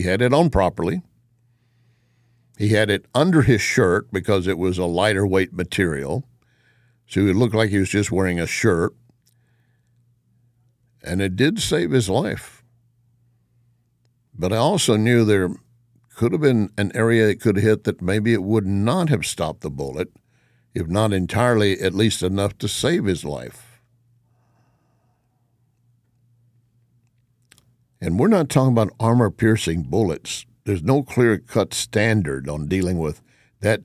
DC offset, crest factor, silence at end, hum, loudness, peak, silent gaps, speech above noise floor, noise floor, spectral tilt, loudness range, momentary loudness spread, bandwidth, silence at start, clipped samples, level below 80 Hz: under 0.1%; 18 dB; 0 s; none; -20 LUFS; -4 dBFS; none; 46 dB; -65 dBFS; -5.5 dB/octave; 6 LU; 11 LU; 15 kHz; 0 s; under 0.1%; -42 dBFS